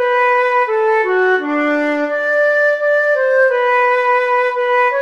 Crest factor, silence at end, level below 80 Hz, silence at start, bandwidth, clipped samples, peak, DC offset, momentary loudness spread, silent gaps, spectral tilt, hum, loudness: 10 dB; 0 s; -72 dBFS; 0 s; 7.8 kHz; under 0.1%; -4 dBFS; 0.2%; 3 LU; none; -2.5 dB/octave; none; -14 LUFS